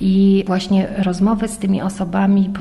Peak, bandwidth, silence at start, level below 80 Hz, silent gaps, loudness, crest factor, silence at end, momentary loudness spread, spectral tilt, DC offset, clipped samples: -6 dBFS; 12 kHz; 0 s; -40 dBFS; none; -17 LUFS; 10 dB; 0 s; 6 LU; -7 dB/octave; under 0.1%; under 0.1%